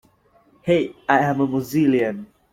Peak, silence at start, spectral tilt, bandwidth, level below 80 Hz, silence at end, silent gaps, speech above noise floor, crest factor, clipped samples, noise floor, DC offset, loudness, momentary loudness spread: -2 dBFS; 0.65 s; -7 dB/octave; 16.5 kHz; -58 dBFS; 0.3 s; none; 38 dB; 20 dB; under 0.1%; -58 dBFS; under 0.1%; -20 LUFS; 9 LU